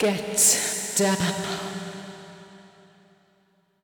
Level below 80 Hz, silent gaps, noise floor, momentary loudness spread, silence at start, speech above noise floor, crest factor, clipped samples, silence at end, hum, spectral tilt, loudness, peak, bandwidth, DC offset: -62 dBFS; none; -65 dBFS; 22 LU; 0 s; 42 dB; 18 dB; under 0.1%; 1.15 s; none; -2.5 dB/octave; -22 LUFS; -8 dBFS; over 20 kHz; under 0.1%